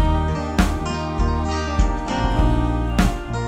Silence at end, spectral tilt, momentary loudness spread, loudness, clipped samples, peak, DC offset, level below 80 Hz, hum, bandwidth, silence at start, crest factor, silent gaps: 0 s; -6 dB/octave; 3 LU; -21 LUFS; under 0.1%; -4 dBFS; under 0.1%; -22 dBFS; none; 14.5 kHz; 0 s; 16 dB; none